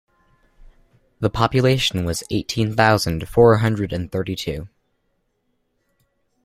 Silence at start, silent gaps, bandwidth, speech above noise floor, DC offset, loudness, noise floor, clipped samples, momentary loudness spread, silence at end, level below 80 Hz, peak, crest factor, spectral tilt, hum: 1.2 s; none; 15.5 kHz; 51 dB; under 0.1%; -19 LUFS; -69 dBFS; under 0.1%; 11 LU; 1.8 s; -44 dBFS; -2 dBFS; 20 dB; -5.5 dB/octave; none